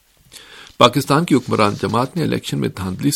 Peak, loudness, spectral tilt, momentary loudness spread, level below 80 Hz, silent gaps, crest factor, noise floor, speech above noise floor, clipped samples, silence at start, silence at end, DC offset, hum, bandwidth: 0 dBFS; -17 LUFS; -5.5 dB/octave; 9 LU; -50 dBFS; none; 18 dB; -44 dBFS; 27 dB; under 0.1%; 0.35 s; 0 s; under 0.1%; none; 17 kHz